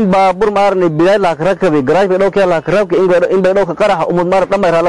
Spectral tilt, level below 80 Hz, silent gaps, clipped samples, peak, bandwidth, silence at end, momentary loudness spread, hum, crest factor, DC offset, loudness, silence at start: -6.5 dB/octave; -42 dBFS; none; under 0.1%; -4 dBFS; 11.5 kHz; 0 s; 2 LU; none; 6 dB; 1%; -11 LUFS; 0 s